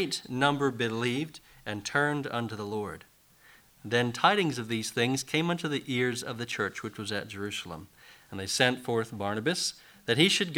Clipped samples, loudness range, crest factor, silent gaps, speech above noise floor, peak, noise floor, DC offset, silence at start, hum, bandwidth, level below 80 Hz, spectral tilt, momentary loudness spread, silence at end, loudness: under 0.1%; 4 LU; 24 dB; none; 29 dB; -8 dBFS; -59 dBFS; under 0.1%; 0 s; none; over 20 kHz; -66 dBFS; -4 dB/octave; 14 LU; 0 s; -29 LUFS